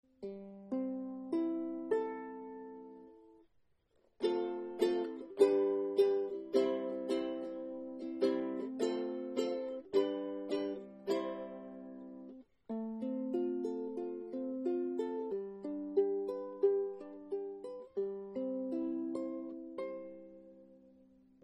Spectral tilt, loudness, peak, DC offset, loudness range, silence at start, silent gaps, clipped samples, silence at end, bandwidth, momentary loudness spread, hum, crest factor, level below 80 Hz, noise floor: -6 dB/octave; -37 LUFS; -16 dBFS; under 0.1%; 7 LU; 0.2 s; none; under 0.1%; 0.55 s; 9.6 kHz; 16 LU; none; 22 dB; -80 dBFS; -73 dBFS